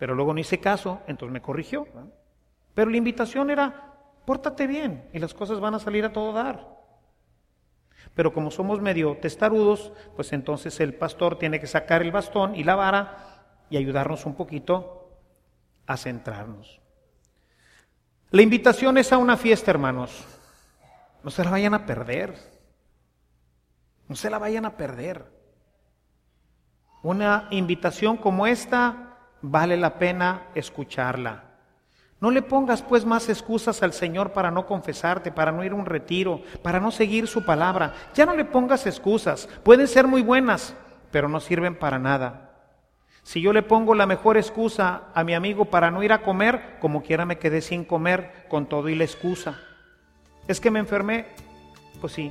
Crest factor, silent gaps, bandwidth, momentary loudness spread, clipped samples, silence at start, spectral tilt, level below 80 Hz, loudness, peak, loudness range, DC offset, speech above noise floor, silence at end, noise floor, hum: 24 dB; none; 14.5 kHz; 15 LU; under 0.1%; 0 s; -6 dB/octave; -54 dBFS; -23 LUFS; 0 dBFS; 10 LU; under 0.1%; 43 dB; 0 s; -66 dBFS; none